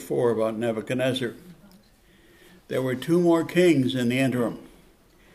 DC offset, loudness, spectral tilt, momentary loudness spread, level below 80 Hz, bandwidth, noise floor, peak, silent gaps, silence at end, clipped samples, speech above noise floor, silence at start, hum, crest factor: under 0.1%; -24 LUFS; -6.5 dB/octave; 10 LU; -62 dBFS; 15 kHz; -57 dBFS; -8 dBFS; none; 0.7 s; under 0.1%; 33 dB; 0 s; none; 18 dB